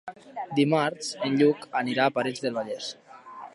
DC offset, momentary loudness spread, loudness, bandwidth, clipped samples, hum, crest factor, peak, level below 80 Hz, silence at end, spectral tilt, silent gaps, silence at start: under 0.1%; 17 LU; -26 LUFS; 11.5 kHz; under 0.1%; none; 18 dB; -8 dBFS; -78 dBFS; 0.05 s; -5 dB/octave; none; 0.05 s